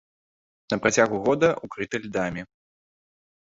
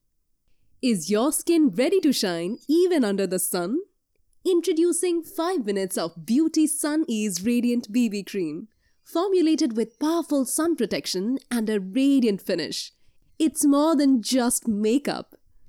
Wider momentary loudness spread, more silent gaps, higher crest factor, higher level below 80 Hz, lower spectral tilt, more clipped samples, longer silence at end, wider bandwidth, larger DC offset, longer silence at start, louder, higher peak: about the same, 10 LU vs 9 LU; neither; first, 22 dB vs 12 dB; first, -58 dBFS vs -66 dBFS; about the same, -4.5 dB/octave vs -4 dB/octave; neither; first, 0.95 s vs 0.45 s; second, 8 kHz vs 18 kHz; neither; second, 0.7 s vs 0.85 s; about the same, -24 LUFS vs -23 LUFS; first, -4 dBFS vs -12 dBFS